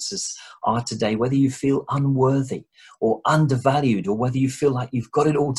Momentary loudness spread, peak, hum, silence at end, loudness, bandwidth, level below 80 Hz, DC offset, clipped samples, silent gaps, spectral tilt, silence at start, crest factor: 7 LU; -4 dBFS; none; 0 s; -22 LUFS; 12 kHz; -56 dBFS; under 0.1%; under 0.1%; none; -6 dB/octave; 0 s; 18 dB